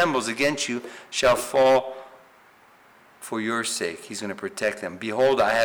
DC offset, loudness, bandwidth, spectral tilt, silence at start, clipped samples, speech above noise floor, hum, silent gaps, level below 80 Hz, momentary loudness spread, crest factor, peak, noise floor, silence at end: under 0.1%; -24 LUFS; over 20 kHz; -3 dB/octave; 0 s; under 0.1%; 31 dB; none; none; -58 dBFS; 13 LU; 12 dB; -12 dBFS; -54 dBFS; 0 s